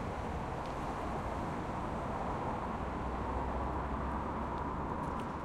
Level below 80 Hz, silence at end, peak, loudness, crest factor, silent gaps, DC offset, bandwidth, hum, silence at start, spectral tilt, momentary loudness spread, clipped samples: -46 dBFS; 0 s; -24 dBFS; -38 LUFS; 12 dB; none; under 0.1%; 12.5 kHz; none; 0 s; -7 dB/octave; 2 LU; under 0.1%